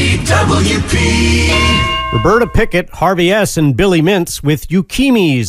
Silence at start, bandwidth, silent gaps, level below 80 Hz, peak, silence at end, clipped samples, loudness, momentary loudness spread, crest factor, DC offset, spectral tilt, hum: 0 s; 16 kHz; none; -22 dBFS; 0 dBFS; 0 s; under 0.1%; -12 LUFS; 4 LU; 12 dB; under 0.1%; -5 dB/octave; none